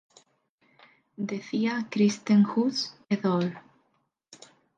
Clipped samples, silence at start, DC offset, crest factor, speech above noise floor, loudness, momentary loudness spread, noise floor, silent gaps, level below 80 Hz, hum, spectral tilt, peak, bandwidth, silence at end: under 0.1%; 1.2 s; under 0.1%; 16 dB; 48 dB; -27 LUFS; 12 LU; -73 dBFS; none; -76 dBFS; none; -6 dB/octave; -12 dBFS; 7.6 kHz; 0.4 s